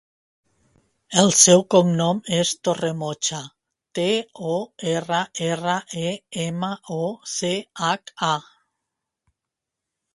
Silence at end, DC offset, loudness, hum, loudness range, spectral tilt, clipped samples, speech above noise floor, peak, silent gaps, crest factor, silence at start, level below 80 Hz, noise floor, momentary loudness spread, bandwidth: 1.75 s; under 0.1%; -21 LUFS; none; 8 LU; -3.5 dB/octave; under 0.1%; 63 dB; 0 dBFS; none; 24 dB; 1.1 s; -64 dBFS; -85 dBFS; 13 LU; 11.5 kHz